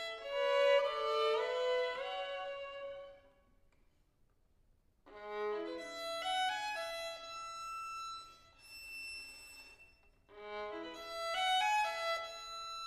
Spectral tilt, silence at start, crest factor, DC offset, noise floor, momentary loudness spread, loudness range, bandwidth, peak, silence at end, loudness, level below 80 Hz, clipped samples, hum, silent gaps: -0.5 dB/octave; 0 s; 20 dB; under 0.1%; -72 dBFS; 19 LU; 12 LU; 15 kHz; -20 dBFS; 0 s; -37 LUFS; -70 dBFS; under 0.1%; none; none